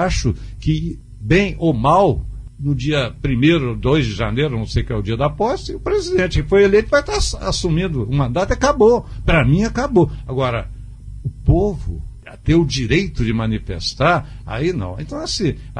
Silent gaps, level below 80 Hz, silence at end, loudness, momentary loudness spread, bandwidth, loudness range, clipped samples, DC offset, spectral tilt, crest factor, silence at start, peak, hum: none; -28 dBFS; 0 s; -18 LUFS; 12 LU; 10.5 kHz; 3 LU; under 0.1%; under 0.1%; -6 dB/octave; 16 dB; 0 s; -2 dBFS; none